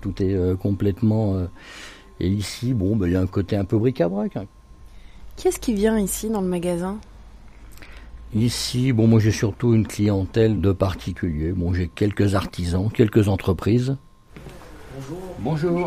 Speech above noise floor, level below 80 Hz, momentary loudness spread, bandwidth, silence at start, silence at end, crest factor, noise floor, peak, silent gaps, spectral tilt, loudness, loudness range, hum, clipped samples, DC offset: 22 dB; -40 dBFS; 16 LU; 15.5 kHz; 0 s; 0 s; 18 dB; -43 dBFS; -4 dBFS; none; -6.5 dB/octave; -22 LUFS; 5 LU; none; under 0.1%; under 0.1%